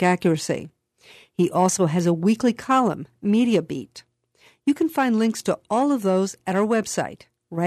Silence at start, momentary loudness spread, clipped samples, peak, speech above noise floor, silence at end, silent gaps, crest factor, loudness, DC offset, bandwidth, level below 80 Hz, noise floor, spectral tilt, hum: 0 s; 10 LU; under 0.1%; -6 dBFS; 37 dB; 0 s; none; 16 dB; -22 LUFS; under 0.1%; 13.5 kHz; -64 dBFS; -58 dBFS; -5.5 dB/octave; none